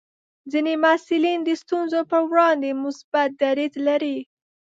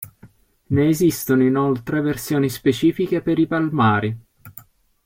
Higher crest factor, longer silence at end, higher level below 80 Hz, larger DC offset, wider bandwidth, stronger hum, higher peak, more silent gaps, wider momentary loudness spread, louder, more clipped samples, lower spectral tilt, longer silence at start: about the same, 18 dB vs 14 dB; about the same, 0.45 s vs 0.45 s; second, -78 dBFS vs -52 dBFS; neither; second, 7.8 kHz vs 16.5 kHz; neither; about the same, -4 dBFS vs -6 dBFS; first, 3.04-3.12 s vs none; first, 8 LU vs 5 LU; about the same, -21 LUFS vs -19 LUFS; neither; second, -3.5 dB/octave vs -6.5 dB/octave; first, 0.45 s vs 0 s